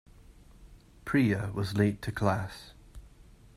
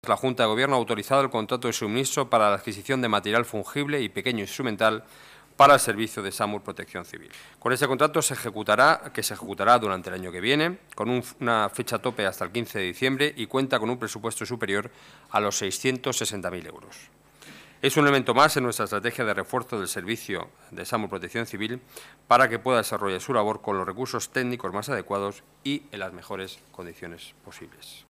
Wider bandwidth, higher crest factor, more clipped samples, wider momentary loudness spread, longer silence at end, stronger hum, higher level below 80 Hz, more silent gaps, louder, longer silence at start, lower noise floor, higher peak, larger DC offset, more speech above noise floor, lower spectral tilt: about the same, 14.5 kHz vs 15.5 kHz; about the same, 22 dB vs 20 dB; neither; about the same, 19 LU vs 17 LU; first, 0.5 s vs 0.1 s; neither; first, -54 dBFS vs -64 dBFS; neither; second, -30 LUFS vs -25 LUFS; first, 0.3 s vs 0.05 s; first, -55 dBFS vs -49 dBFS; second, -10 dBFS vs -6 dBFS; neither; about the same, 26 dB vs 23 dB; first, -7 dB/octave vs -3.5 dB/octave